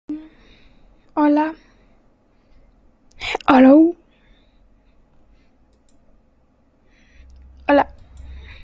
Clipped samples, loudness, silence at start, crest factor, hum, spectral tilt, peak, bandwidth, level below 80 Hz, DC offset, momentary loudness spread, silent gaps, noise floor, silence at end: under 0.1%; -16 LUFS; 0.1 s; 20 dB; none; -6 dB/octave; 0 dBFS; 7.6 kHz; -48 dBFS; under 0.1%; 28 LU; none; -58 dBFS; 0.25 s